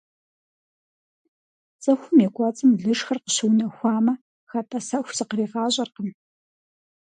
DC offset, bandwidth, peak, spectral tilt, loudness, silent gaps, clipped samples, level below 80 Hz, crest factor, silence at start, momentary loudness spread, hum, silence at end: under 0.1%; 9.8 kHz; -6 dBFS; -4.5 dB/octave; -23 LUFS; 4.21-4.47 s; under 0.1%; -74 dBFS; 18 dB; 1.8 s; 12 LU; none; 0.9 s